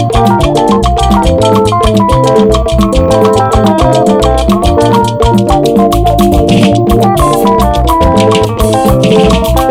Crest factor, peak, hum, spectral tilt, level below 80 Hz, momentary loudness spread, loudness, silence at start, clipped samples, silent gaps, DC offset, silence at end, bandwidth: 6 dB; 0 dBFS; none; -6.5 dB/octave; -16 dBFS; 2 LU; -8 LUFS; 0 s; 3%; none; under 0.1%; 0 s; over 20 kHz